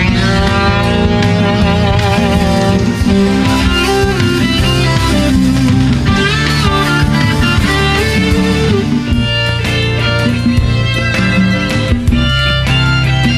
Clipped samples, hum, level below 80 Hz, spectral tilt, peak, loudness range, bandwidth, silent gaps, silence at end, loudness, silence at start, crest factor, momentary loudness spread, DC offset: under 0.1%; none; -20 dBFS; -5.5 dB/octave; 0 dBFS; 1 LU; 15.5 kHz; none; 0 s; -11 LUFS; 0 s; 10 dB; 2 LU; under 0.1%